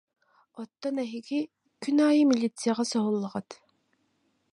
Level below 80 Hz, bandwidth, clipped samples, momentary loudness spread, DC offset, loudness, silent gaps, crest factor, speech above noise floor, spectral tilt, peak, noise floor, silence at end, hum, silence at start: -80 dBFS; 11.5 kHz; under 0.1%; 17 LU; under 0.1%; -27 LUFS; none; 16 dB; 46 dB; -5 dB/octave; -12 dBFS; -73 dBFS; 1 s; none; 0.55 s